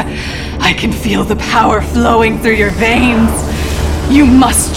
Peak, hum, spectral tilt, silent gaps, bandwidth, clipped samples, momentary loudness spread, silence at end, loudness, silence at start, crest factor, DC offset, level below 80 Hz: 0 dBFS; none; -4.5 dB/octave; none; 17 kHz; 0.3%; 9 LU; 0 s; -11 LUFS; 0 s; 10 dB; 0.1%; -22 dBFS